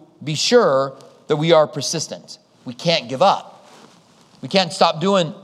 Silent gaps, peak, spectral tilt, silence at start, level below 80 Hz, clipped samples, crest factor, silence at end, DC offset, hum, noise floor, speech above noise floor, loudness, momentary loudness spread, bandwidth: none; 0 dBFS; -4 dB/octave; 0.2 s; -74 dBFS; under 0.1%; 20 dB; 0.05 s; under 0.1%; none; -51 dBFS; 33 dB; -18 LUFS; 14 LU; 13.5 kHz